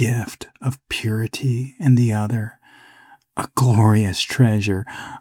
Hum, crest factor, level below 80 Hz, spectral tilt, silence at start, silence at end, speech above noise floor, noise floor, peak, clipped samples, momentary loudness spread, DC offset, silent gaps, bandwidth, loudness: none; 16 dB; -54 dBFS; -6 dB/octave; 0 s; 0 s; 31 dB; -50 dBFS; -4 dBFS; under 0.1%; 13 LU; under 0.1%; none; 16 kHz; -20 LUFS